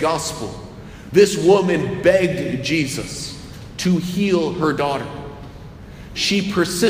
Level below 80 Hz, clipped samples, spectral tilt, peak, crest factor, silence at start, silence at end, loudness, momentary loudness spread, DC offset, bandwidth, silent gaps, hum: -44 dBFS; under 0.1%; -5 dB/octave; -2 dBFS; 18 dB; 0 s; 0 s; -19 LUFS; 21 LU; under 0.1%; 15.5 kHz; none; none